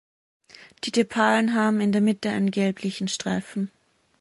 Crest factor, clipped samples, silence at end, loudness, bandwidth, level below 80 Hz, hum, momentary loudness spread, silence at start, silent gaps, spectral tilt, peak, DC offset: 18 dB; under 0.1%; 0.55 s; -24 LUFS; 11.5 kHz; -66 dBFS; none; 11 LU; 0.85 s; none; -5 dB/octave; -6 dBFS; under 0.1%